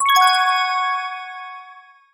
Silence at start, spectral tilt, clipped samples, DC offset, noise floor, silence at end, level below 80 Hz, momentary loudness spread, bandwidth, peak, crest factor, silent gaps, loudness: 0 s; 4 dB/octave; under 0.1%; under 0.1%; -45 dBFS; 0.35 s; -76 dBFS; 21 LU; 17 kHz; -2 dBFS; 18 dB; none; -17 LUFS